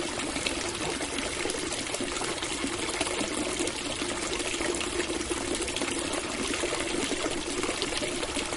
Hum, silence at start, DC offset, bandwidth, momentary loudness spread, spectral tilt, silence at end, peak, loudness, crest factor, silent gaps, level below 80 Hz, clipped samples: none; 0 s; under 0.1%; 11.5 kHz; 2 LU; -2 dB/octave; 0 s; -10 dBFS; -30 LUFS; 22 dB; none; -48 dBFS; under 0.1%